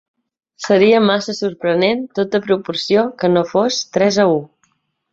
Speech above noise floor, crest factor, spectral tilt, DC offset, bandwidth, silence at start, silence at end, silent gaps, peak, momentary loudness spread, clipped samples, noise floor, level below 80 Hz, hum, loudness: 48 dB; 14 dB; -5 dB/octave; under 0.1%; 8 kHz; 0.6 s; 0.65 s; none; -2 dBFS; 8 LU; under 0.1%; -63 dBFS; -60 dBFS; none; -16 LUFS